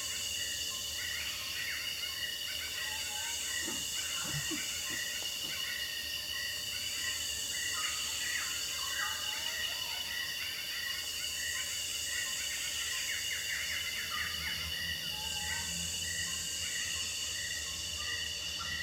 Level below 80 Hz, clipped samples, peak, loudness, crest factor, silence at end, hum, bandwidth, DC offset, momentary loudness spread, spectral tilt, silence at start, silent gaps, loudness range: -60 dBFS; under 0.1%; -22 dBFS; -34 LUFS; 16 dB; 0 s; none; 19 kHz; under 0.1%; 2 LU; 0.5 dB/octave; 0 s; none; 1 LU